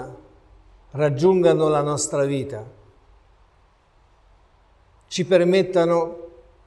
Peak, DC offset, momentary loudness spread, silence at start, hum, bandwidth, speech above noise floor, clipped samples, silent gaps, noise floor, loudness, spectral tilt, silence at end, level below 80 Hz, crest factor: -4 dBFS; under 0.1%; 18 LU; 0 s; none; 12 kHz; 38 dB; under 0.1%; none; -58 dBFS; -20 LUFS; -5.5 dB/octave; 0.4 s; -56 dBFS; 18 dB